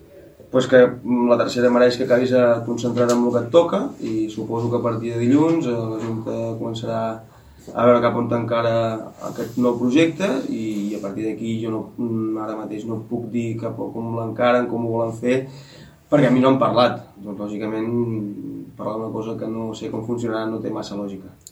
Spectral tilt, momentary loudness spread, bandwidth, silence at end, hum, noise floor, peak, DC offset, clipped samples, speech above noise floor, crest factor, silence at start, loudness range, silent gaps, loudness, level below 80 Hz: -6.5 dB/octave; 13 LU; 13.5 kHz; 0.2 s; none; -45 dBFS; -2 dBFS; under 0.1%; under 0.1%; 25 dB; 20 dB; 0.15 s; 8 LU; none; -21 LUFS; -58 dBFS